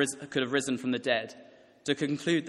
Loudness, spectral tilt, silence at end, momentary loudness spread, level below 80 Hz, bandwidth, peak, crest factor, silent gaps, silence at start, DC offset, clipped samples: -30 LUFS; -4 dB/octave; 0 s; 6 LU; -74 dBFS; 12.5 kHz; -12 dBFS; 20 dB; none; 0 s; under 0.1%; under 0.1%